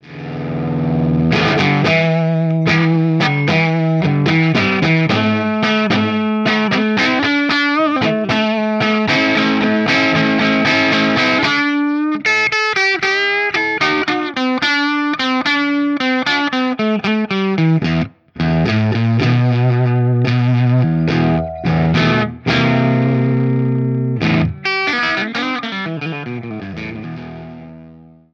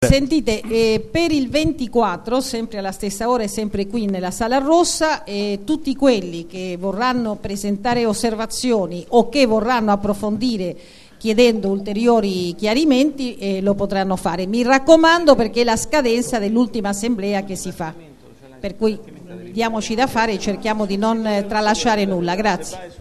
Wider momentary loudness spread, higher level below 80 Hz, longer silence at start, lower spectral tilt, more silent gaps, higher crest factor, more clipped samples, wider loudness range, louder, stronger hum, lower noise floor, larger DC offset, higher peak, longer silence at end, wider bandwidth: second, 7 LU vs 10 LU; second, -44 dBFS vs -38 dBFS; about the same, 0.05 s vs 0 s; first, -6.5 dB/octave vs -4.5 dB/octave; neither; about the same, 14 dB vs 18 dB; neither; second, 3 LU vs 6 LU; first, -15 LUFS vs -18 LUFS; neither; about the same, -41 dBFS vs -44 dBFS; second, under 0.1% vs 0.2%; about the same, 0 dBFS vs 0 dBFS; first, 0.3 s vs 0.05 s; second, 7.4 kHz vs 13 kHz